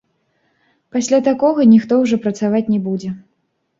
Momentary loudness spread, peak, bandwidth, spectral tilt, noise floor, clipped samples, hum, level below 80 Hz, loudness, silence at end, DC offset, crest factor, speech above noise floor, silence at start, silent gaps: 13 LU; -2 dBFS; 7.8 kHz; -6.5 dB/octave; -64 dBFS; under 0.1%; none; -60 dBFS; -15 LUFS; 0.6 s; under 0.1%; 14 dB; 50 dB; 0.95 s; none